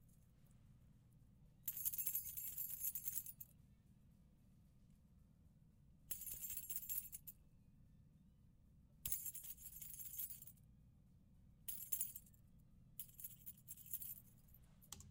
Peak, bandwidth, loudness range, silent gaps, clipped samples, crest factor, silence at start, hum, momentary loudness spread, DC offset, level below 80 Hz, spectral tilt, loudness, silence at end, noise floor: -24 dBFS; 18 kHz; 6 LU; none; under 0.1%; 30 dB; 0 s; none; 16 LU; under 0.1%; -72 dBFS; -1.5 dB/octave; -46 LUFS; 0 s; -69 dBFS